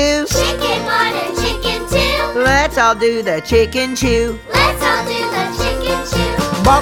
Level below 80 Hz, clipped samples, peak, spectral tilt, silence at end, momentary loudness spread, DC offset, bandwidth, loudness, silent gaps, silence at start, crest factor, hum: -28 dBFS; under 0.1%; 0 dBFS; -4 dB/octave; 0 s; 5 LU; under 0.1%; 19 kHz; -15 LUFS; none; 0 s; 16 dB; none